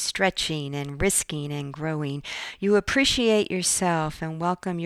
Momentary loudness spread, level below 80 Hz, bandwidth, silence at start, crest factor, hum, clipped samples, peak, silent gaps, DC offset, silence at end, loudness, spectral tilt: 11 LU; -46 dBFS; 15.5 kHz; 0 s; 16 dB; none; under 0.1%; -10 dBFS; none; under 0.1%; 0 s; -24 LUFS; -3.5 dB/octave